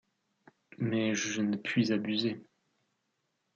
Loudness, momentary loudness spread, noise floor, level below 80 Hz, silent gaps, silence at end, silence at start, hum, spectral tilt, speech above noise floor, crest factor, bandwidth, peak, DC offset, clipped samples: -31 LUFS; 7 LU; -80 dBFS; -78 dBFS; none; 1.15 s; 0.8 s; none; -4.5 dB/octave; 49 dB; 18 dB; 7.8 kHz; -16 dBFS; under 0.1%; under 0.1%